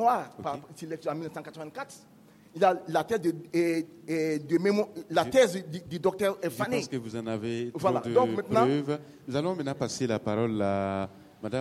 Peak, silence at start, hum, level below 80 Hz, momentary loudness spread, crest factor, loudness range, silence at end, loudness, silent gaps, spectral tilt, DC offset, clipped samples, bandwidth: -10 dBFS; 0 s; none; -66 dBFS; 14 LU; 18 dB; 3 LU; 0 s; -29 LUFS; none; -5.5 dB/octave; under 0.1%; under 0.1%; 16 kHz